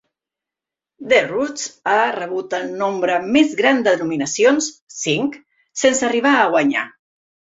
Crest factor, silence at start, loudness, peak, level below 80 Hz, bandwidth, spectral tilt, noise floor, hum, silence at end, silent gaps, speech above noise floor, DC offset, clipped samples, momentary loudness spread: 18 dB; 1 s; -18 LUFS; -2 dBFS; -62 dBFS; 8 kHz; -3 dB/octave; -87 dBFS; none; 0.7 s; 4.81-4.87 s; 70 dB; under 0.1%; under 0.1%; 10 LU